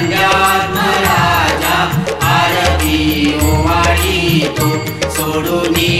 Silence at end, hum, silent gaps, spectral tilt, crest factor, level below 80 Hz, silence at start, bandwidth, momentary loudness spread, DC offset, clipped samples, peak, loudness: 0 s; none; none; -4.5 dB/octave; 12 dB; -26 dBFS; 0 s; 16.5 kHz; 5 LU; under 0.1%; under 0.1%; 0 dBFS; -12 LUFS